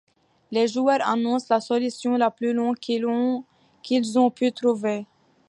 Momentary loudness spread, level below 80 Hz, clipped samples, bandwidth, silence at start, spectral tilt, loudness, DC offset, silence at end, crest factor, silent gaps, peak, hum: 6 LU; -76 dBFS; under 0.1%; 11 kHz; 0.5 s; -5 dB/octave; -23 LUFS; under 0.1%; 0.45 s; 16 dB; none; -6 dBFS; none